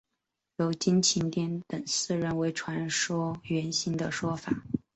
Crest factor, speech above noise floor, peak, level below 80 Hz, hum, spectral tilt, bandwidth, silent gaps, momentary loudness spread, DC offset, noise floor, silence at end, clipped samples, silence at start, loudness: 18 dB; 55 dB; -12 dBFS; -62 dBFS; none; -4 dB/octave; 8.2 kHz; none; 9 LU; under 0.1%; -84 dBFS; 0.2 s; under 0.1%; 0.6 s; -29 LUFS